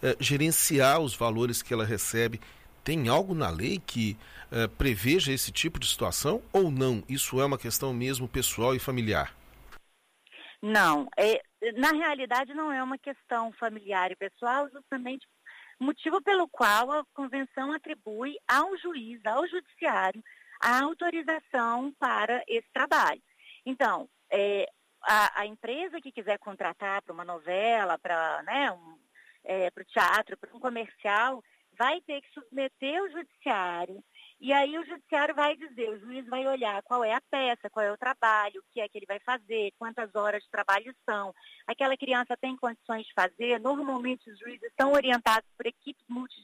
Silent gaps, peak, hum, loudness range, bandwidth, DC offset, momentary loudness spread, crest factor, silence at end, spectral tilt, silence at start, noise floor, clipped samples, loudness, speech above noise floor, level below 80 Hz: none; -12 dBFS; none; 4 LU; 15.5 kHz; under 0.1%; 12 LU; 18 dB; 0.05 s; -3.5 dB/octave; 0 s; -66 dBFS; under 0.1%; -29 LUFS; 37 dB; -54 dBFS